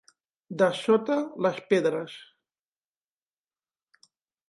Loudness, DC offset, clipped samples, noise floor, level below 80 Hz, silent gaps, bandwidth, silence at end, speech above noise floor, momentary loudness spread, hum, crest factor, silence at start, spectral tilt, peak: -26 LUFS; under 0.1%; under 0.1%; under -90 dBFS; -80 dBFS; none; 11.5 kHz; 2.25 s; over 65 dB; 17 LU; none; 20 dB; 0.5 s; -6 dB/octave; -10 dBFS